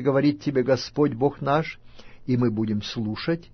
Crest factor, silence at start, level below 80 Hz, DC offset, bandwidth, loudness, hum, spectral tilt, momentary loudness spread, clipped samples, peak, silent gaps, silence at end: 16 dB; 0 s; -52 dBFS; under 0.1%; 6.6 kHz; -24 LUFS; none; -7 dB/octave; 7 LU; under 0.1%; -8 dBFS; none; 0.1 s